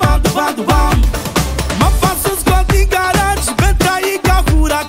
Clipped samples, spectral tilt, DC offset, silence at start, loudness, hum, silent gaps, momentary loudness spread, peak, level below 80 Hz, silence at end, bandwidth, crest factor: under 0.1%; -4.5 dB/octave; under 0.1%; 0 s; -14 LUFS; none; none; 3 LU; 0 dBFS; -16 dBFS; 0 s; 16.5 kHz; 12 dB